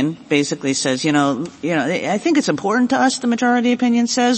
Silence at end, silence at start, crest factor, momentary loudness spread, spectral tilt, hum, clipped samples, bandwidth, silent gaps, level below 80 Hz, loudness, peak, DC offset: 0 s; 0 s; 14 dB; 4 LU; -4 dB/octave; none; under 0.1%; 8.8 kHz; none; -62 dBFS; -18 LUFS; -2 dBFS; under 0.1%